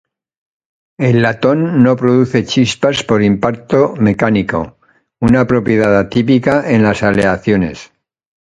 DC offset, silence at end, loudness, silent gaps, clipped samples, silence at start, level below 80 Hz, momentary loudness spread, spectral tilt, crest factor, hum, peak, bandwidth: under 0.1%; 0.6 s; -13 LUFS; none; under 0.1%; 1 s; -40 dBFS; 5 LU; -6.5 dB/octave; 12 dB; none; 0 dBFS; 9.6 kHz